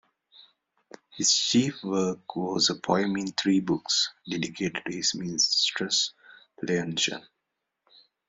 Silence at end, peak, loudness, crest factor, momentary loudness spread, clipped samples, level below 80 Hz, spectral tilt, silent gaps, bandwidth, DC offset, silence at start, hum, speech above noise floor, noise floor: 1.1 s; -8 dBFS; -26 LUFS; 20 dB; 9 LU; under 0.1%; -68 dBFS; -2.5 dB/octave; none; 8.2 kHz; under 0.1%; 1.15 s; none; 56 dB; -83 dBFS